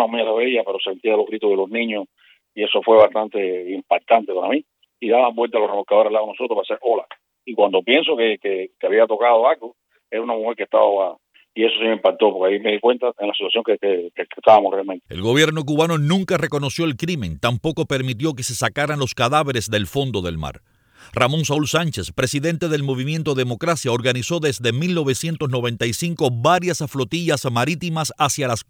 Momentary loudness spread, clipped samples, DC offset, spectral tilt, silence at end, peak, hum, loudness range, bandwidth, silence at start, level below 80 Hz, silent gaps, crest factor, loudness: 8 LU; under 0.1%; under 0.1%; -5 dB/octave; 0.05 s; 0 dBFS; none; 3 LU; 20 kHz; 0 s; -52 dBFS; none; 20 dB; -19 LUFS